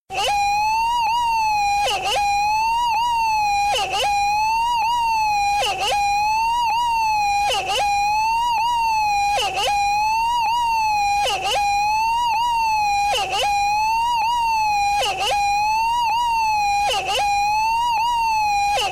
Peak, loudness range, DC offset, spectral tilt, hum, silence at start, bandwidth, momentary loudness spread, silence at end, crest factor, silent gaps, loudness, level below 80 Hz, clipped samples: -14 dBFS; 0 LU; under 0.1%; -0.5 dB/octave; none; 0.1 s; 16 kHz; 1 LU; 0 s; 6 dB; none; -19 LUFS; -44 dBFS; under 0.1%